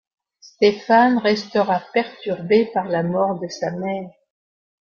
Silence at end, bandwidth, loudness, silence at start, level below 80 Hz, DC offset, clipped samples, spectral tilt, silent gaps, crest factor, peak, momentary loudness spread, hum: 0.8 s; 7 kHz; -20 LUFS; 0.45 s; -64 dBFS; under 0.1%; under 0.1%; -6 dB/octave; none; 18 dB; -2 dBFS; 12 LU; none